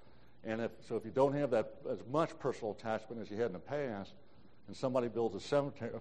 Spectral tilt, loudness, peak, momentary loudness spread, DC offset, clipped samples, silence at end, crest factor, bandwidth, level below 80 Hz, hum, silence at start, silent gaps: -7 dB/octave; -37 LUFS; -18 dBFS; 10 LU; 0.2%; under 0.1%; 0 s; 20 dB; 9.4 kHz; -70 dBFS; none; 0.45 s; none